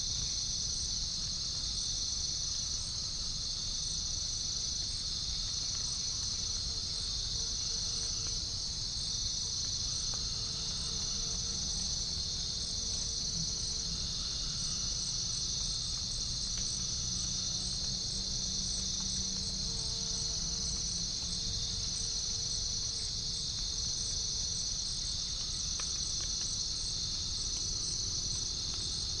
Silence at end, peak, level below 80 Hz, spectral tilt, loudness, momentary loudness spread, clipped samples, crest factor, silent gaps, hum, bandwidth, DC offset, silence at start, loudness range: 0 s; -20 dBFS; -46 dBFS; -1 dB/octave; -33 LUFS; 1 LU; under 0.1%; 14 dB; none; none; 10.5 kHz; under 0.1%; 0 s; 0 LU